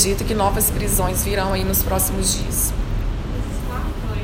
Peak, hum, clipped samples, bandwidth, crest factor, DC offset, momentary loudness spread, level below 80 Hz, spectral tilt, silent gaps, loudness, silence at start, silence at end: -2 dBFS; none; under 0.1%; 17 kHz; 18 dB; under 0.1%; 9 LU; -24 dBFS; -4 dB/octave; none; -20 LUFS; 0 s; 0 s